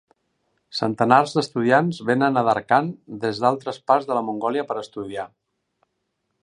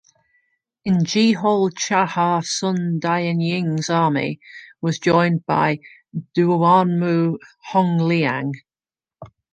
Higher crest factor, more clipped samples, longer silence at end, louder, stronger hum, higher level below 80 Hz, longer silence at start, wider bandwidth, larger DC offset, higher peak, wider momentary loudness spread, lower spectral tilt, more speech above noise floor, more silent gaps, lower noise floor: about the same, 22 dB vs 18 dB; neither; first, 1.15 s vs 0.25 s; about the same, -21 LUFS vs -19 LUFS; neither; about the same, -66 dBFS vs -62 dBFS; about the same, 0.75 s vs 0.85 s; first, 10.5 kHz vs 9.2 kHz; neither; about the same, 0 dBFS vs -2 dBFS; about the same, 14 LU vs 12 LU; about the same, -6 dB/octave vs -5.5 dB/octave; second, 54 dB vs over 71 dB; neither; second, -75 dBFS vs under -90 dBFS